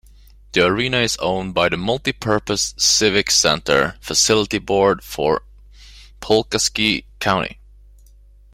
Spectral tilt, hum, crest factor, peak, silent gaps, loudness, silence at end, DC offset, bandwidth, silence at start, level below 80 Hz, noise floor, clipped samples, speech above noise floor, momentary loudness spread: -2.5 dB/octave; none; 18 dB; -2 dBFS; none; -17 LUFS; 1 s; under 0.1%; 16.5 kHz; 0.55 s; -42 dBFS; -47 dBFS; under 0.1%; 29 dB; 7 LU